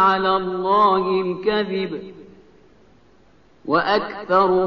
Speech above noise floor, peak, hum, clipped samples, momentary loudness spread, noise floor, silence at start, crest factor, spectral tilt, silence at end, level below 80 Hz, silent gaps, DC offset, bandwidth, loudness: 36 dB; -4 dBFS; 50 Hz at -65 dBFS; under 0.1%; 13 LU; -55 dBFS; 0 s; 16 dB; -3.5 dB/octave; 0 s; -56 dBFS; none; 0.2%; 6 kHz; -20 LUFS